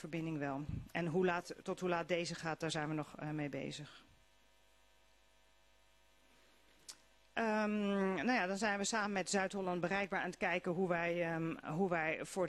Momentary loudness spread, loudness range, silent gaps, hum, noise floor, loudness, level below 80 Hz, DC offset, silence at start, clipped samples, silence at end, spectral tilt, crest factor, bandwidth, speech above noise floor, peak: 10 LU; 12 LU; none; none; -71 dBFS; -38 LUFS; -68 dBFS; under 0.1%; 0 s; under 0.1%; 0 s; -5 dB/octave; 18 dB; 13 kHz; 33 dB; -20 dBFS